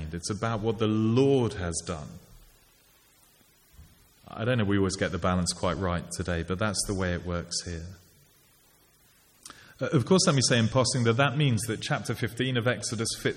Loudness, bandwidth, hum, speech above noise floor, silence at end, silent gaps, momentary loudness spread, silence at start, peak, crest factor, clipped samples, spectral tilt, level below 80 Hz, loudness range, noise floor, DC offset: -27 LUFS; 16 kHz; none; 35 dB; 0 s; none; 13 LU; 0 s; -10 dBFS; 20 dB; under 0.1%; -4.5 dB/octave; -50 dBFS; 9 LU; -61 dBFS; under 0.1%